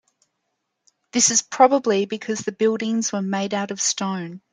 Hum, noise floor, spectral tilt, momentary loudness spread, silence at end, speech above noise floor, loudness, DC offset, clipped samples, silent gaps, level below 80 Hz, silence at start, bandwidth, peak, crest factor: none; -76 dBFS; -3 dB/octave; 10 LU; 0.15 s; 55 dB; -21 LUFS; under 0.1%; under 0.1%; none; -70 dBFS; 1.15 s; 10.5 kHz; -2 dBFS; 20 dB